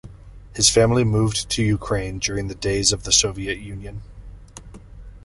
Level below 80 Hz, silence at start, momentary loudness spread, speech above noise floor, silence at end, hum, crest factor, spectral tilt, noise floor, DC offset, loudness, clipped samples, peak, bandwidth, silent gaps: -38 dBFS; 0.05 s; 19 LU; 21 dB; 0.05 s; none; 22 dB; -3.5 dB/octave; -41 dBFS; under 0.1%; -19 LUFS; under 0.1%; -2 dBFS; 11.5 kHz; none